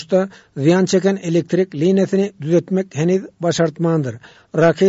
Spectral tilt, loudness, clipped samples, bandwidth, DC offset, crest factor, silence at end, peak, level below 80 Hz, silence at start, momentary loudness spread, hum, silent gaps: -6.5 dB/octave; -18 LUFS; under 0.1%; 8 kHz; under 0.1%; 14 dB; 0 s; -4 dBFS; -60 dBFS; 0 s; 6 LU; none; none